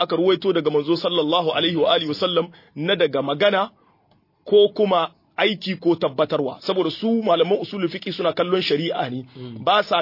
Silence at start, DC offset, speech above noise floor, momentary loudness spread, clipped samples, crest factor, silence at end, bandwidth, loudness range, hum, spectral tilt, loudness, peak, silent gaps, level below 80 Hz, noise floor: 0 s; under 0.1%; 41 dB; 8 LU; under 0.1%; 16 dB; 0 s; 5.8 kHz; 2 LU; none; -6.5 dB/octave; -21 LUFS; -4 dBFS; none; -68 dBFS; -61 dBFS